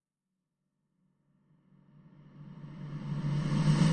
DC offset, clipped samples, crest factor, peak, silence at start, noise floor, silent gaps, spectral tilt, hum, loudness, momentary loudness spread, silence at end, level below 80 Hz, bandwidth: under 0.1%; under 0.1%; 20 dB; -16 dBFS; 2.35 s; -87 dBFS; none; -7 dB/octave; none; -32 LUFS; 22 LU; 0 s; -58 dBFS; 9.2 kHz